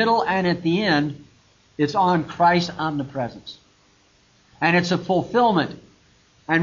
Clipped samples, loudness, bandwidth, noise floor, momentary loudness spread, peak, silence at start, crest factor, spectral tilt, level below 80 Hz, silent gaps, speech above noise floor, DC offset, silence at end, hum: under 0.1%; -21 LUFS; 7.4 kHz; -58 dBFS; 14 LU; -4 dBFS; 0 s; 18 dB; -6 dB/octave; -58 dBFS; none; 37 dB; under 0.1%; 0 s; none